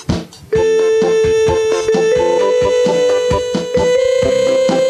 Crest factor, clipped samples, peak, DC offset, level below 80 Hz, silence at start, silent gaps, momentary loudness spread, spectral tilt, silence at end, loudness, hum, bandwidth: 12 dB; under 0.1%; 0 dBFS; under 0.1%; -36 dBFS; 0 s; none; 4 LU; -4.5 dB/octave; 0 s; -14 LUFS; none; 11.5 kHz